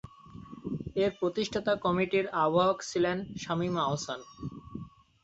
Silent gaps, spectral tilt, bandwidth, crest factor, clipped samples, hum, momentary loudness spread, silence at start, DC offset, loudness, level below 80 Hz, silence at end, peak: none; -5.5 dB/octave; 8.2 kHz; 18 dB; under 0.1%; none; 18 LU; 0.05 s; under 0.1%; -30 LUFS; -58 dBFS; 0.35 s; -14 dBFS